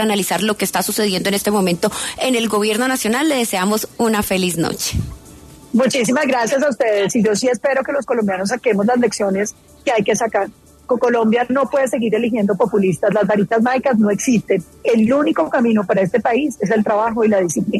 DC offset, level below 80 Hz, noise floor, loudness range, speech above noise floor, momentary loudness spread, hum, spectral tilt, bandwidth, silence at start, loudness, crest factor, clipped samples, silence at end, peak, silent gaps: under 0.1%; -44 dBFS; -40 dBFS; 2 LU; 24 dB; 4 LU; none; -4.5 dB/octave; 13.5 kHz; 0 s; -17 LUFS; 12 dB; under 0.1%; 0 s; -4 dBFS; none